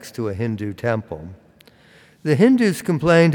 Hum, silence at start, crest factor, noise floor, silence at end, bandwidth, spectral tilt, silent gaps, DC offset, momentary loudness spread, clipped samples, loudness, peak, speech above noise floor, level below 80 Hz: none; 0 s; 16 dB; -51 dBFS; 0 s; 18 kHz; -7 dB/octave; none; under 0.1%; 18 LU; under 0.1%; -19 LUFS; -2 dBFS; 33 dB; -54 dBFS